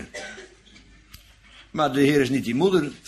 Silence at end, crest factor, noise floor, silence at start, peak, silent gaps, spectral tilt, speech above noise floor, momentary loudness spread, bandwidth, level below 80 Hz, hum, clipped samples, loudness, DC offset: 0.1 s; 18 dB; -51 dBFS; 0 s; -8 dBFS; none; -6 dB/octave; 30 dB; 18 LU; 14.5 kHz; -54 dBFS; none; under 0.1%; -22 LUFS; under 0.1%